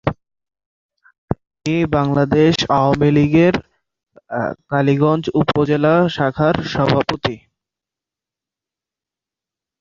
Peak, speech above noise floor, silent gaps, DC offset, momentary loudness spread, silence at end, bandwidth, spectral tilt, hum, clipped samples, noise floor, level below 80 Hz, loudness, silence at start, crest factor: -2 dBFS; 72 dB; 0.66-0.89 s, 1.18-1.28 s; under 0.1%; 11 LU; 2.45 s; 7.6 kHz; -7 dB/octave; none; under 0.1%; -88 dBFS; -44 dBFS; -17 LUFS; 0.05 s; 16 dB